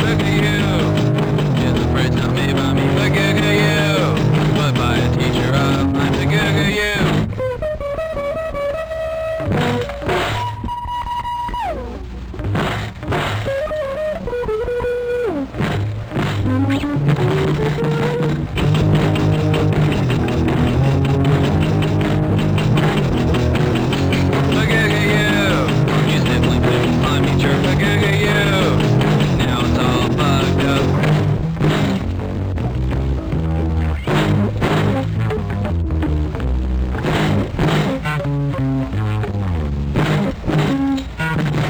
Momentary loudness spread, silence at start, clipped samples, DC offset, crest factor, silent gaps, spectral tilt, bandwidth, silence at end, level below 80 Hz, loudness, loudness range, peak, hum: 7 LU; 0 s; under 0.1%; under 0.1%; 14 dB; none; -6.5 dB/octave; over 20 kHz; 0 s; -28 dBFS; -17 LUFS; 6 LU; -2 dBFS; none